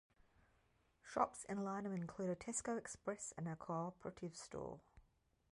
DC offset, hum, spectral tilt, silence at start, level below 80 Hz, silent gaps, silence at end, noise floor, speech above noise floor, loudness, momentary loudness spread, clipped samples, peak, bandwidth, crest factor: under 0.1%; none; -5 dB/octave; 1.05 s; -74 dBFS; none; 0.55 s; -78 dBFS; 33 dB; -46 LUFS; 10 LU; under 0.1%; -24 dBFS; 11 kHz; 24 dB